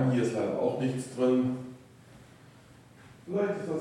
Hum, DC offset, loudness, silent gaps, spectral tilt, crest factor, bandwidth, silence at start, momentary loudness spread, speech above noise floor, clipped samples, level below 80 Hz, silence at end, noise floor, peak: none; under 0.1%; -30 LUFS; none; -7.5 dB/octave; 16 dB; 11.5 kHz; 0 s; 18 LU; 26 dB; under 0.1%; -70 dBFS; 0 s; -55 dBFS; -16 dBFS